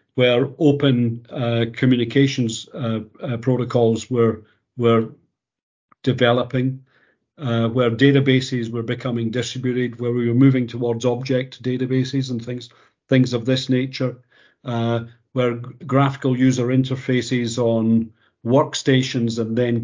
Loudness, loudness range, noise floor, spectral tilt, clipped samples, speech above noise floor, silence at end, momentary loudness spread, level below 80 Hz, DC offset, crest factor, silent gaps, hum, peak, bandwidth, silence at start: -20 LUFS; 3 LU; -60 dBFS; -6.5 dB/octave; under 0.1%; 41 dB; 0 s; 10 LU; -58 dBFS; under 0.1%; 18 dB; 5.63-5.88 s; none; 0 dBFS; 7.6 kHz; 0.15 s